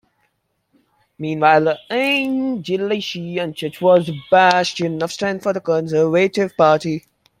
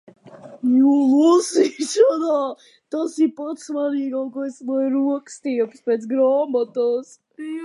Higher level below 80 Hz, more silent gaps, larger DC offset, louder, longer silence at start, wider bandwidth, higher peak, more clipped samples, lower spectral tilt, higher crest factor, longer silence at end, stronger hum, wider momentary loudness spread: first, -62 dBFS vs -80 dBFS; neither; neither; about the same, -18 LUFS vs -20 LUFS; first, 1.2 s vs 0.25 s; first, 15.5 kHz vs 11.5 kHz; about the same, -2 dBFS vs -4 dBFS; neither; first, -5.5 dB/octave vs -4 dB/octave; about the same, 18 dB vs 16 dB; first, 0.4 s vs 0 s; neither; second, 10 LU vs 13 LU